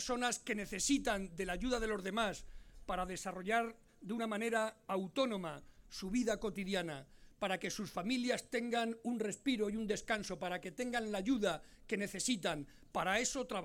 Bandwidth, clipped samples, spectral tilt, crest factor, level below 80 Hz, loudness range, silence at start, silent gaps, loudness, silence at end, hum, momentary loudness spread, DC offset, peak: 17 kHz; under 0.1%; -3.5 dB/octave; 18 dB; -58 dBFS; 2 LU; 0 s; none; -38 LUFS; 0 s; none; 9 LU; under 0.1%; -22 dBFS